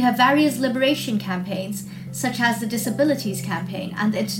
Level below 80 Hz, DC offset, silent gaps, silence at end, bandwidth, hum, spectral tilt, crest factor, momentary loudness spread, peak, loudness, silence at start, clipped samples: -62 dBFS; under 0.1%; none; 0 s; 17 kHz; none; -4.5 dB/octave; 16 dB; 11 LU; -6 dBFS; -22 LUFS; 0 s; under 0.1%